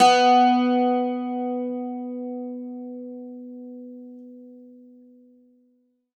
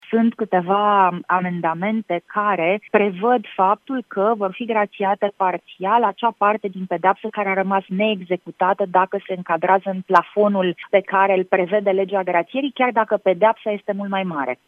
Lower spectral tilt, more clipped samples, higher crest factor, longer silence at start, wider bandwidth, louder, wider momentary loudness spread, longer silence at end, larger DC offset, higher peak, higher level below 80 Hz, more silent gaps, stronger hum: second, -3 dB/octave vs -8 dB/octave; neither; about the same, 18 dB vs 20 dB; about the same, 0 s vs 0.1 s; first, 10.5 kHz vs 6.2 kHz; about the same, -22 LUFS vs -20 LUFS; first, 25 LU vs 7 LU; first, 1.5 s vs 0.15 s; neither; second, -6 dBFS vs 0 dBFS; second, -84 dBFS vs -76 dBFS; neither; neither